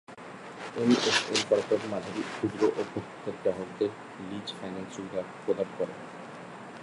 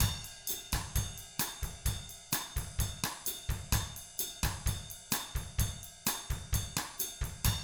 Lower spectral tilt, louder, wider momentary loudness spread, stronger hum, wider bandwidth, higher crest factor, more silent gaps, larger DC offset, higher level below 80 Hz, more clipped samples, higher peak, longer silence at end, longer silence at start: about the same, -4 dB/octave vs -3 dB/octave; first, -30 LUFS vs -36 LUFS; first, 18 LU vs 4 LU; neither; second, 11.5 kHz vs over 20 kHz; about the same, 20 dB vs 22 dB; neither; neither; second, -68 dBFS vs -42 dBFS; neither; first, -10 dBFS vs -14 dBFS; about the same, 0 s vs 0 s; about the same, 0.1 s vs 0 s